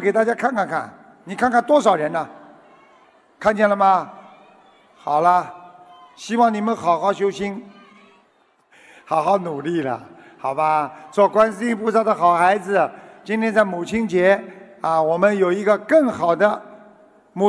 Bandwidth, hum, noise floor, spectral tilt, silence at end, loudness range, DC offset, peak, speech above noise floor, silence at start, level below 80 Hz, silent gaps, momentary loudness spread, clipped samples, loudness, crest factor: 11 kHz; none; -60 dBFS; -6 dB/octave; 0 s; 5 LU; under 0.1%; -2 dBFS; 41 dB; 0 s; -62 dBFS; none; 13 LU; under 0.1%; -19 LUFS; 18 dB